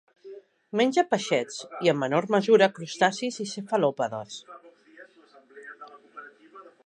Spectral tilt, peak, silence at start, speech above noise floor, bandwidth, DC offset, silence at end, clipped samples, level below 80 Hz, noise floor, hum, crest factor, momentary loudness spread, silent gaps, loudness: -4.5 dB/octave; -6 dBFS; 0.25 s; 31 dB; 10.5 kHz; under 0.1%; 0.2 s; under 0.1%; -80 dBFS; -56 dBFS; none; 22 dB; 25 LU; none; -25 LUFS